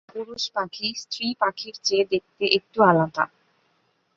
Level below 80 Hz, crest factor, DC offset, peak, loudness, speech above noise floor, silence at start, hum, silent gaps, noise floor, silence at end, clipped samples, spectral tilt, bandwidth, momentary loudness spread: -66 dBFS; 22 dB; under 0.1%; -2 dBFS; -23 LUFS; 44 dB; 0.15 s; none; none; -68 dBFS; 0.9 s; under 0.1%; -4 dB/octave; 7.6 kHz; 10 LU